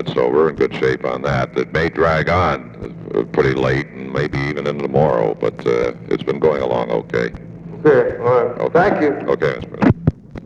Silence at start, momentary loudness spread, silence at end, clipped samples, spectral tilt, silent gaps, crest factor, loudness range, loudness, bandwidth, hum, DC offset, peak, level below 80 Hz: 0 s; 7 LU; 0 s; under 0.1%; -7.5 dB/octave; none; 16 dB; 2 LU; -18 LUFS; 7.6 kHz; none; under 0.1%; 0 dBFS; -40 dBFS